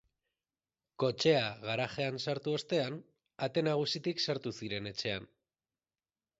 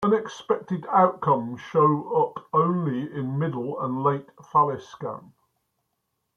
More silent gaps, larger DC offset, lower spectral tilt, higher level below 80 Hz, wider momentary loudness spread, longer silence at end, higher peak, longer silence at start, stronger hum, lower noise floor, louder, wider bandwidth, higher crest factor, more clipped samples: neither; neither; second, -3.5 dB/octave vs -8.5 dB/octave; about the same, -70 dBFS vs -68 dBFS; about the same, 10 LU vs 11 LU; about the same, 1.15 s vs 1.15 s; second, -14 dBFS vs -6 dBFS; first, 1 s vs 0 s; neither; first, under -90 dBFS vs -77 dBFS; second, -34 LUFS vs -24 LUFS; first, 8 kHz vs 7.2 kHz; about the same, 22 dB vs 20 dB; neither